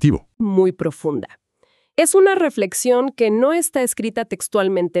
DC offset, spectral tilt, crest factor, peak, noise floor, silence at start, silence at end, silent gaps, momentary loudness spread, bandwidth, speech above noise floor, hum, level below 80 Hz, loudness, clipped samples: under 0.1%; -5 dB/octave; 14 dB; -2 dBFS; -62 dBFS; 0 s; 0 s; none; 11 LU; 14 kHz; 45 dB; none; -48 dBFS; -18 LUFS; under 0.1%